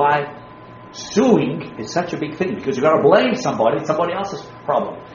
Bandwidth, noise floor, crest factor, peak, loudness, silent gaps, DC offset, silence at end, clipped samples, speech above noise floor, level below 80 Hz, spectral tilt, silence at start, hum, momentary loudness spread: 7.2 kHz; -39 dBFS; 18 dB; 0 dBFS; -19 LUFS; none; under 0.1%; 0 s; under 0.1%; 21 dB; -56 dBFS; -4.5 dB/octave; 0 s; none; 15 LU